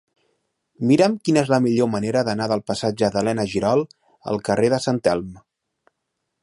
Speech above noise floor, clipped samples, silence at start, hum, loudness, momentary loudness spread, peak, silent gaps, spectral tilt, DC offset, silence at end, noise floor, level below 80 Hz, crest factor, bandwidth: 58 dB; under 0.1%; 0.8 s; none; -21 LUFS; 9 LU; -4 dBFS; none; -6 dB/octave; under 0.1%; 1.05 s; -78 dBFS; -54 dBFS; 18 dB; 11.5 kHz